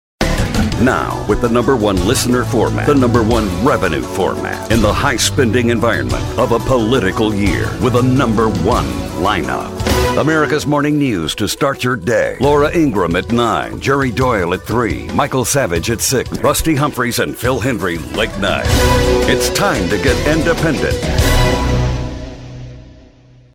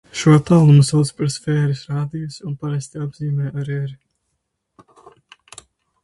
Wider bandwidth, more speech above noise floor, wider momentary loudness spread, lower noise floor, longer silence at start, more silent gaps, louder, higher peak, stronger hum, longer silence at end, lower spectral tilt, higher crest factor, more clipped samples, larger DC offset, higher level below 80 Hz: first, 16.5 kHz vs 11.5 kHz; second, 30 dB vs 57 dB; second, 5 LU vs 16 LU; second, -44 dBFS vs -74 dBFS; about the same, 0.2 s vs 0.15 s; neither; first, -15 LUFS vs -18 LUFS; about the same, 0 dBFS vs -2 dBFS; neither; second, 0.6 s vs 2.1 s; second, -5 dB/octave vs -7 dB/octave; about the same, 14 dB vs 16 dB; neither; neither; first, -26 dBFS vs -54 dBFS